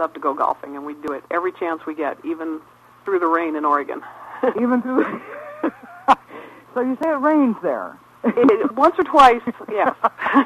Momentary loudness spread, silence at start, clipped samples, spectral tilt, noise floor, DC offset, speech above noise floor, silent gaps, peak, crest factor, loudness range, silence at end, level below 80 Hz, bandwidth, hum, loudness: 15 LU; 0 s; under 0.1%; -5.5 dB/octave; -40 dBFS; under 0.1%; 21 dB; none; -2 dBFS; 18 dB; 7 LU; 0 s; -58 dBFS; 13 kHz; none; -20 LUFS